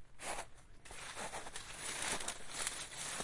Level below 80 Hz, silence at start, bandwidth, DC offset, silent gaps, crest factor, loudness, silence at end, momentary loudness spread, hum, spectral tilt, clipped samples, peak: -60 dBFS; 0 s; 11.5 kHz; under 0.1%; none; 24 dB; -43 LUFS; 0 s; 12 LU; none; -0.5 dB/octave; under 0.1%; -20 dBFS